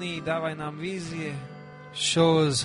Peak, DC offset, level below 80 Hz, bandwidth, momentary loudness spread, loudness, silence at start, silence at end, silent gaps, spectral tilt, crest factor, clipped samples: -10 dBFS; under 0.1%; -60 dBFS; 11 kHz; 18 LU; -26 LUFS; 0 s; 0 s; none; -4.5 dB/octave; 16 dB; under 0.1%